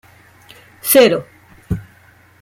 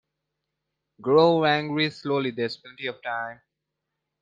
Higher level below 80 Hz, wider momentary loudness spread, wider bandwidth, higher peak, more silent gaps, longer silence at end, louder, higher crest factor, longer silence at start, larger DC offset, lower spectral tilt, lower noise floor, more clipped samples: first, -44 dBFS vs -70 dBFS; about the same, 16 LU vs 15 LU; first, 16.5 kHz vs 7.6 kHz; first, -2 dBFS vs -6 dBFS; neither; second, 0.6 s vs 0.85 s; first, -15 LUFS vs -24 LUFS; about the same, 18 dB vs 20 dB; second, 0.85 s vs 1 s; neither; second, -4 dB/octave vs -7 dB/octave; second, -49 dBFS vs -83 dBFS; neither